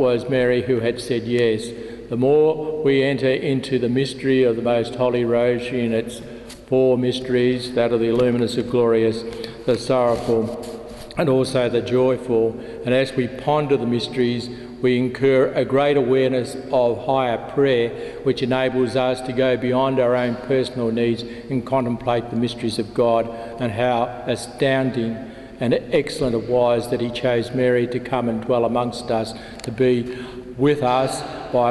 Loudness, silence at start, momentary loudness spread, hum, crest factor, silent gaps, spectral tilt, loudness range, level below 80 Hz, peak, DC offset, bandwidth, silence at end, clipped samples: -20 LUFS; 0 s; 9 LU; none; 14 dB; none; -6.5 dB/octave; 3 LU; -50 dBFS; -6 dBFS; under 0.1%; 12.5 kHz; 0 s; under 0.1%